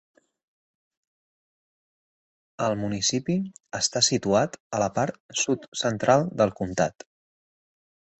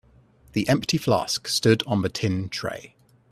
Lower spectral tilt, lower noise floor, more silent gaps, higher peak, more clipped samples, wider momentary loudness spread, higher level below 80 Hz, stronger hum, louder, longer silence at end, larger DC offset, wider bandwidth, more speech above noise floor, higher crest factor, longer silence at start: second, -3.5 dB/octave vs -5 dB/octave; first, under -90 dBFS vs -55 dBFS; first, 4.60-4.71 s, 5.20-5.29 s, 5.68-5.72 s vs none; about the same, -6 dBFS vs -4 dBFS; neither; second, 7 LU vs 10 LU; about the same, -58 dBFS vs -56 dBFS; neither; about the same, -25 LUFS vs -24 LUFS; first, 1.3 s vs 0.45 s; neither; second, 8.6 kHz vs 15 kHz; first, over 65 dB vs 32 dB; about the same, 22 dB vs 20 dB; first, 2.6 s vs 0.55 s